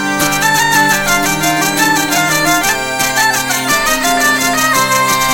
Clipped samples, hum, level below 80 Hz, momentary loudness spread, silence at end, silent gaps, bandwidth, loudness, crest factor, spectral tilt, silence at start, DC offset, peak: under 0.1%; none; -36 dBFS; 3 LU; 0 s; none; 17 kHz; -11 LUFS; 12 dB; -2 dB/octave; 0 s; under 0.1%; 0 dBFS